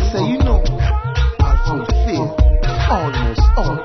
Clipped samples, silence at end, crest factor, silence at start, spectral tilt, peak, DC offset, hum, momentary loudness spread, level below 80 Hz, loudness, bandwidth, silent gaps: under 0.1%; 0 s; 12 dB; 0 s; -7 dB/octave; -2 dBFS; under 0.1%; none; 3 LU; -16 dBFS; -17 LUFS; 6.4 kHz; none